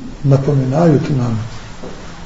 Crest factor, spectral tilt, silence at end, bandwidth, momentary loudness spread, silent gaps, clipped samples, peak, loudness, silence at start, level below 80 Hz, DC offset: 16 dB; -8.5 dB/octave; 0 s; 7.8 kHz; 19 LU; none; under 0.1%; 0 dBFS; -15 LUFS; 0 s; -34 dBFS; under 0.1%